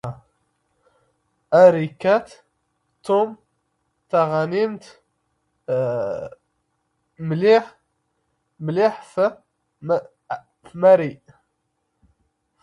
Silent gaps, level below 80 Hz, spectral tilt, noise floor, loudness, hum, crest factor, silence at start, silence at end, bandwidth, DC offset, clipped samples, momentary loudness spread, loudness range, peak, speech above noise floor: none; -64 dBFS; -7.5 dB/octave; -73 dBFS; -20 LUFS; none; 22 dB; 0.05 s; 1.45 s; 11 kHz; under 0.1%; under 0.1%; 20 LU; 5 LU; -2 dBFS; 55 dB